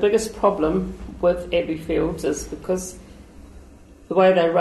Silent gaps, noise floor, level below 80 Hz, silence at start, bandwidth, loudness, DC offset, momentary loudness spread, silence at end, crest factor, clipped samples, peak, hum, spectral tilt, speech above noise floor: none; -46 dBFS; -42 dBFS; 0 s; 12.5 kHz; -22 LUFS; under 0.1%; 11 LU; 0 s; 16 dB; under 0.1%; -6 dBFS; none; -5.5 dB/octave; 25 dB